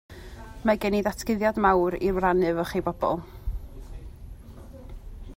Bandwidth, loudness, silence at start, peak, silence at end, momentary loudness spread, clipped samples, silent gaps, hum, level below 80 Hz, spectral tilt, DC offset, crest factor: 16 kHz; -25 LUFS; 0.1 s; -8 dBFS; 0 s; 23 LU; under 0.1%; none; none; -40 dBFS; -6.5 dB/octave; under 0.1%; 20 dB